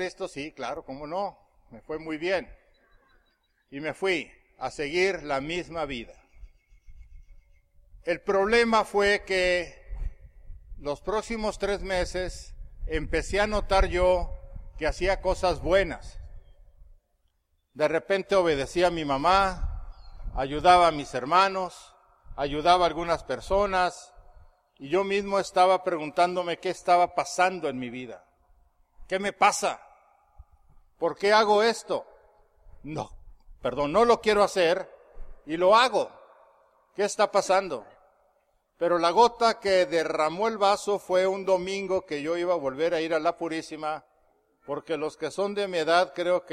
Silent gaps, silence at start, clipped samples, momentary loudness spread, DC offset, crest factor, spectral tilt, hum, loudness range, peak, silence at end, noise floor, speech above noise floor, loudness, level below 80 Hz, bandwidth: none; 0 s; under 0.1%; 16 LU; under 0.1%; 20 dB; -4 dB/octave; none; 7 LU; -6 dBFS; 0 s; -71 dBFS; 46 dB; -26 LUFS; -42 dBFS; 14 kHz